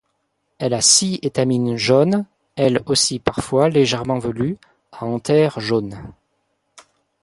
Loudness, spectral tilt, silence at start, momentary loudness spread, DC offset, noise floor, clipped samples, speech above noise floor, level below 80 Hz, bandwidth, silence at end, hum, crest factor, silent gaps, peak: -18 LUFS; -4 dB/octave; 0.6 s; 12 LU; under 0.1%; -70 dBFS; under 0.1%; 52 dB; -50 dBFS; 11.5 kHz; 1.1 s; none; 20 dB; none; 0 dBFS